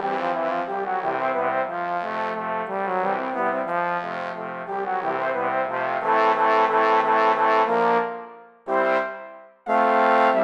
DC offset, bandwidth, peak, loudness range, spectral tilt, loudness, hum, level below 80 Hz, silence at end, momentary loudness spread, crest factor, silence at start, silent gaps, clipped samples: under 0.1%; 9 kHz; -6 dBFS; 5 LU; -6 dB/octave; -22 LUFS; none; -74 dBFS; 0 s; 11 LU; 16 dB; 0 s; none; under 0.1%